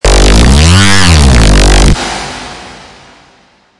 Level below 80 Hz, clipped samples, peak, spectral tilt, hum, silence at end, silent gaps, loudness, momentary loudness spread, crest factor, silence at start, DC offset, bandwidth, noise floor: -10 dBFS; 1%; 0 dBFS; -4 dB/octave; none; 0.95 s; none; -6 LUFS; 17 LU; 6 dB; 0.05 s; under 0.1%; 12 kHz; -45 dBFS